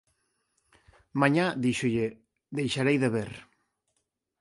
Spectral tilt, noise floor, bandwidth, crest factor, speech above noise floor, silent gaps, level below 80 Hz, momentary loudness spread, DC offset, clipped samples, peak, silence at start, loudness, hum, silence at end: -6 dB/octave; -80 dBFS; 11.5 kHz; 22 dB; 53 dB; none; -64 dBFS; 13 LU; under 0.1%; under 0.1%; -8 dBFS; 1.15 s; -28 LUFS; none; 1 s